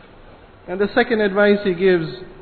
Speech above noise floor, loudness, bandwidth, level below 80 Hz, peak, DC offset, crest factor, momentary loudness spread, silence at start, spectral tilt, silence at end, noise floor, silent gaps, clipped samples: 26 dB; -17 LUFS; 4.6 kHz; -48 dBFS; -4 dBFS; under 0.1%; 16 dB; 10 LU; 0.65 s; -9.5 dB/octave; 0.05 s; -44 dBFS; none; under 0.1%